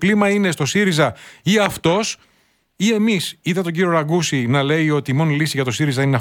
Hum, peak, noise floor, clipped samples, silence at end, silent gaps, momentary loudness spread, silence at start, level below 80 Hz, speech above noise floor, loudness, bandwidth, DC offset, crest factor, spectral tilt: none; -2 dBFS; -60 dBFS; under 0.1%; 0 s; none; 5 LU; 0 s; -54 dBFS; 43 dB; -18 LUFS; 18 kHz; under 0.1%; 16 dB; -5 dB/octave